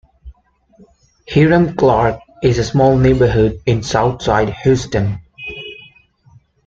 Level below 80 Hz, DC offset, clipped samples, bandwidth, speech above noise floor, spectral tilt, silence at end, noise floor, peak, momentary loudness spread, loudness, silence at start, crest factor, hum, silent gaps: -34 dBFS; under 0.1%; under 0.1%; 7.8 kHz; 39 dB; -7 dB/octave; 0.95 s; -52 dBFS; -2 dBFS; 16 LU; -14 LUFS; 0.25 s; 14 dB; none; none